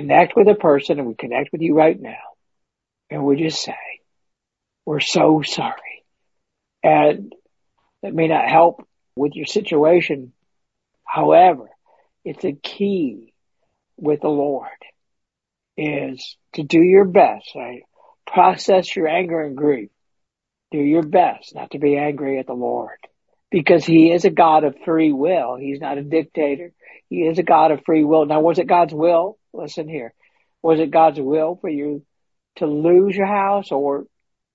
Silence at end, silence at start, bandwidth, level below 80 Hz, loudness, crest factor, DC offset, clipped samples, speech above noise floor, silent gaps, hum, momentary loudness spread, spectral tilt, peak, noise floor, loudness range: 0.5 s; 0 s; 8 kHz; -66 dBFS; -17 LUFS; 18 dB; under 0.1%; under 0.1%; 67 dB; none; none; 17 LU; -6 dB/octave; 0 dBFS; -84 dBFS; 6 LU